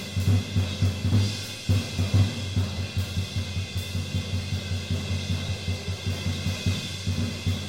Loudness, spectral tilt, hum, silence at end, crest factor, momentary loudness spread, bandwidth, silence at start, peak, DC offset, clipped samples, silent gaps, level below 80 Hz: -28 LUFS; -5 dB/octave; none; 0 s; 16 dB; 6 LU; 16 kHz; 0 s; -10 dBFS; 0.2%; under 0.1%; none; -44 dBFS